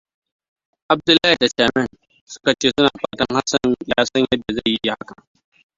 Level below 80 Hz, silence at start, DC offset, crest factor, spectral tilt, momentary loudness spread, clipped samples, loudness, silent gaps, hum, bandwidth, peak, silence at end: -50 dBFS; 0.9 s; under 0.1%; 20 dB; -3.5 dB/octave; 9 LU; under 0.1%; -18 LUFS; 2.21-2.27 s; none; 7.8 kHz; 0 dBFS; 0.85 s